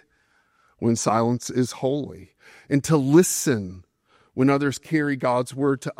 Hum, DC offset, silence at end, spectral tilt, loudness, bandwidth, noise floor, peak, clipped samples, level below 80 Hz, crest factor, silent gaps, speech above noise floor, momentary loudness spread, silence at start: none; under 0.1%; 0.05 s; -5.5 dB/octave; -22 LUFS; 16 kHz; -65 dBFS; -4 dBFS; under 0.1%; -62 dBFS; 20 dB; none; 43 dB; 10 LU; 0.8 s